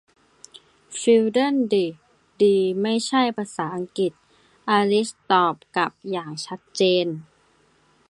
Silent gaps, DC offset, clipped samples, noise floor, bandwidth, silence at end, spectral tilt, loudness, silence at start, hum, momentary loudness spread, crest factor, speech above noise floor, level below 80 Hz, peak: none; under 0.1%; under 0.1%; -61 dBFS; 11.5 kHz; 0.85 s; -4.5 dB/octave; -22 LUFS; 0.9 s; none; 12 LU; 18 dB; 39 dB; -70 dBFS; -6 dBFS